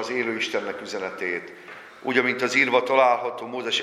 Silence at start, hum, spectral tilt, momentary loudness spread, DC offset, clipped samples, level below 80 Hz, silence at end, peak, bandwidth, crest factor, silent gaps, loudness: 0 s; none; -3 dB/octave; 14 LU; under 0.1%; under 0.1%; -74 dBFS; 0 s; -4 dBFS; 13 kHz; 20 dB; none; -23 LUFS